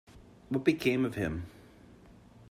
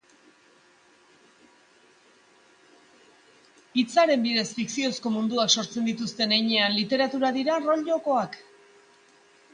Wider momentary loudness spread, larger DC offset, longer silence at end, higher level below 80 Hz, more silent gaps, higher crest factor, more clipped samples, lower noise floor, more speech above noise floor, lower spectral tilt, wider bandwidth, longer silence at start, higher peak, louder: first, 13 LU vs 8 LU; neither; second, 0.1 s vs 1.15 s; first, -58 dBFS vs -74 dBFS; neither; about the same, 22 dB vs 20 dB; neither; about the same, -56 dBFS vs -59 dBFS; second, 26 dB vs 34 dB; first, -6.5 dB/octave vs -3 dB/octave; first, 15 kHz vs 10 kHz; second, 0.15 s vs 3.75 s; second, -12 dBFS vs -8 dBFS; second, -31 LUFS vs -24 LUFS